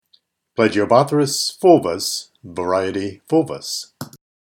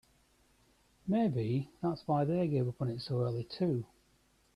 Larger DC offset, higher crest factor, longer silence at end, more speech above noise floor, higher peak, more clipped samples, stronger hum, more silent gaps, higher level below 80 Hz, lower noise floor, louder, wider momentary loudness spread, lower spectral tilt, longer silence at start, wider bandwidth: neither; about the same, 20 dB vs 16 dB; second, 0.45 s vs 0.7 s; first, 43 dB vs 37 dB; first, 0 dBFS vs -20 dBFS; neither; neither; neither; about the same, -62 dBFS vs -66 dBFS; second, -61 dBFS vs -70 dBFS; first, -18 LUFS vs -34 LUFS; first, 17 LU vs 7 LU; second, -4.5 dB/octave vs -9 dB/octave; second, 0.6 s vs 1.05 s; first, 18 kHz vs 11.5 kHz